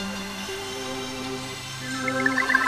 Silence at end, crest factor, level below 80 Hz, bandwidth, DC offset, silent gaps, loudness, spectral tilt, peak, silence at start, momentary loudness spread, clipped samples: 0 s; 22 dB; -54 dBFS; 15 kHz; under 0.1%; none; -28 LUFS; -3 dB/octave; -6 dBFS; 0 s; 9 LU; under 0.1%